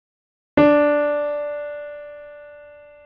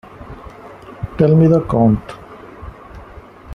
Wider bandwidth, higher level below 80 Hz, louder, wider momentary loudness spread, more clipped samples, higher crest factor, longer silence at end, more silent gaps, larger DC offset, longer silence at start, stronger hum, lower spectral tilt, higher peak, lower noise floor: second, 5.2 kHz vs 5.8 kHz; second, -54 dBFS vs -38 dBFS; second, -19 LUFS vs -14 LUFS; about the same, 24 LU vs 25 LU; neither; about the same, 18 dB vs 16 dB; first, 0.35 s vs 0 s; neither; neither; first, 0.55 s vs 0.2 s; neither; second, -8.5 dB/octave vs -10.5 dB/octave; about the same, -4 dBFS vs -2 dBFS; first, -44 dBFS vs -38 dBFS